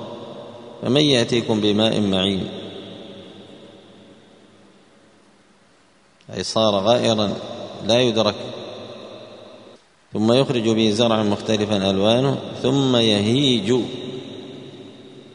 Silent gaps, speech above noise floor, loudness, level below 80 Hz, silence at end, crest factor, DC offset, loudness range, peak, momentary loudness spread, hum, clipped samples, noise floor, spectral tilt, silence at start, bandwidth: none; 37 dB; -19 LUFS; -58 dBFS; 0.05 s; 20 dB; under 0.1%; 8 LU; -2 dBFS; 21 LU; none; under 0.1%; -56 dBFS; -5.5 dB/octave; 0 s; 10.5 kHz